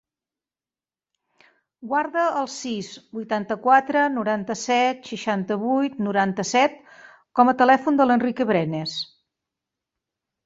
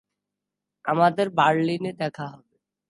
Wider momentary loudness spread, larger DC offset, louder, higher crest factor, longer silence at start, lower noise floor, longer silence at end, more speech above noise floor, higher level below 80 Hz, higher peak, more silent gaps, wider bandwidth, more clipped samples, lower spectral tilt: about the same, 12 LU vs 14 LU; neither; about the same, -22 LUFS vs -23 LUFS; about the same, 20 dB vs 20 dB; first, 1.8 s vs 0.85 s; first, under -90 dBFS vs -85 dBFS; first, 1.4 s vs 0.55 s; first, over 69 dB vs 63 dB; first, -68 dBFS vs -74 dBFS; about the same, -4 dBFS vs -4 dBFS; neither; second, 8 kHz vs 11.5 kHz; neither; second, -4.5 dB/octave vs -6.5 dB/octave